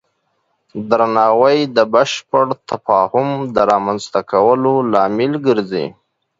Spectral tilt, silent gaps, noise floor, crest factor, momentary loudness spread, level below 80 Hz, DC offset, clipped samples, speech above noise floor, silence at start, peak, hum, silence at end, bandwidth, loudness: -5.5 dB/octave; none; -66 dBFS; 16 dB; 9 LU; -56 dBFS; under 0.1%; under 0.1%; 52 dB; 0.75 s; 0 dBFS; none; 0.5 s; 7.8 kHz; -15 LUFS